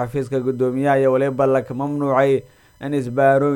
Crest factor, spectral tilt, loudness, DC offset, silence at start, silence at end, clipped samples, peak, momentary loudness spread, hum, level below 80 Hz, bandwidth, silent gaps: 14 dB; -8 dB/octave; -19 LUFS; under 0.1%; 0 s; 0 s; under 0.1%; -4 dBFS; 8 LU; none; -54 dBFS; 17 kHz; none